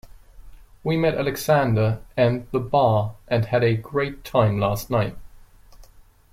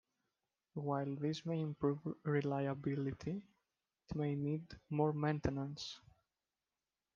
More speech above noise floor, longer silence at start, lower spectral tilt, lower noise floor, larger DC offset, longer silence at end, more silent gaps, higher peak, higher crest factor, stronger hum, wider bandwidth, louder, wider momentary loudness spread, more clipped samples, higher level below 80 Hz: second, 29 dB vs over 51 dB; second, 0.35 s vs 0.75 s; about the same, -7 dB/octave vs -7.5 dB/octave; second, -50 dBFS vs under -90 dBFS; neither; second, 0.5 s vs 1.2 s; neither; first, -4 dBFS vs -22 dBFS; about the same, 18 dB vs 20 dB; neither; first, 16.5 kHz vs 7.4 kHz; first, -22 LUFS vs -40 LUFS; second, 7 LU vs 10 LU; neither; first, -46 dBFS vs -64 dBFS